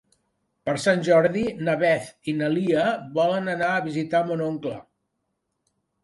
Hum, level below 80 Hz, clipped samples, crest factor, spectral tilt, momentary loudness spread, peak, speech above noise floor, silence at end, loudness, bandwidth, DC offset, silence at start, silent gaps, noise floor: none; -62 dBFS; under 0.1%; 18 dB; -6 dB/octave; 10 LU; -6 dBFS; 54 dB; 1.2 s; -23 LUFS; 11.5 kHz; under 0.1%; 0.65 s; none; -77 dBFS